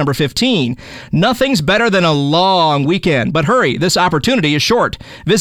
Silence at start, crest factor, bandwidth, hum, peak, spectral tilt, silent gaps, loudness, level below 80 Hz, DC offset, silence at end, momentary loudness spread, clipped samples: 0 s; 14 dB; 18.5 kHz; none; 0 dBFS; -5 dB/octave; none; -13 LUFS; -40 dBFS; under 0.1%; 0 s; 5 LU; under 0.1%